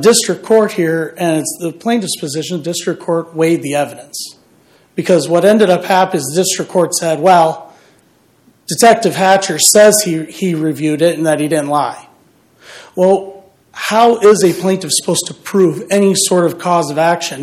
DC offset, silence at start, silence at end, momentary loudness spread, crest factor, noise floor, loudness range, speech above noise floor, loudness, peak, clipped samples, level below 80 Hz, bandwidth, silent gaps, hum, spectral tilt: under 0.1%; 0 s; 0 s; 11 LU; 14 dB; -52 dBFS; 6 LU; 39 dB; -13 LUFS; 0 dBFS; 0.2%; -60 dBFS; 16.5 kHz; none; none; -4 dB/octave